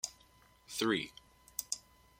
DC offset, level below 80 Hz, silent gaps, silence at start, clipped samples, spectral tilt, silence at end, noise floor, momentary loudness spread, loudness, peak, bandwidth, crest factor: under 0.1%; -70 dBFS; none; 0.05 s; under 0.1%; -2.5 dB/octave; 0.4 s; -65 dBFS; 12 LU; -38 LUFS; -14 dBFS; 16.5 kHz; 26 dB